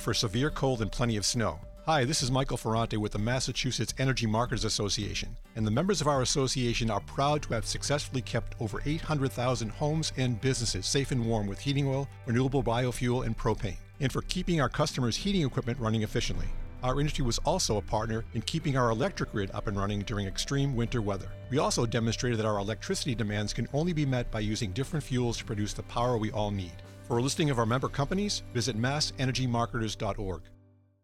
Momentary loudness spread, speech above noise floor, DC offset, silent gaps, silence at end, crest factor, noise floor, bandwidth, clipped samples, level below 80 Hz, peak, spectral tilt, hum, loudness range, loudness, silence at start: 6 LU; 30 dB; under 0.1%; none; 0.5 s; 22 dB; -59 dBFS; 14 kHz; under 0.1%; -42 dBFS; -6 dBFS; -5 dB/octave; none; 2 LU; -30 LUFS; 0 s